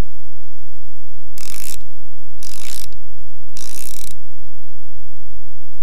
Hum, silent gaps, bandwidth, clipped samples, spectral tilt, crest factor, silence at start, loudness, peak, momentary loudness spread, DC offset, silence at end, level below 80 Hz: none; none; 17 kHz; under 0.1%; -3.5 dB/octave; 26 dB; 0 s; -35 LUFS; -2 dBFS; 16 LU; 60%; 0 s; -46 dBFS